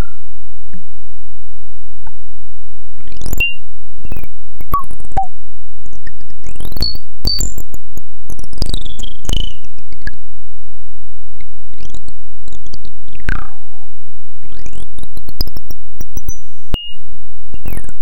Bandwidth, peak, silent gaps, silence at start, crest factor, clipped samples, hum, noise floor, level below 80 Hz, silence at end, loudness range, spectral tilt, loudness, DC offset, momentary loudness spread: 17 kHz; -2 dBFS; none; 0 s; 18 dB; under 0.1%; none; -44 dBFS; -28 dBFS; 0 s; 10 LU; -3.5 dB/octave; -24 LUFS; 80%; 25 LU